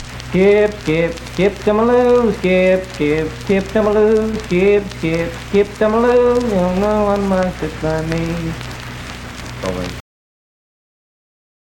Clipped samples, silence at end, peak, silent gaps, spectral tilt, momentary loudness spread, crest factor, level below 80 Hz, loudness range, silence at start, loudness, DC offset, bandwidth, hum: under 0.1%; 1.7 s; -2 dBFS; none; -6.5 dB/octave; 13 LU; 14 dB; -34 dBFS; 10 LU; 0 s; -16 LUFS; under 0.1%; 17 kHz; none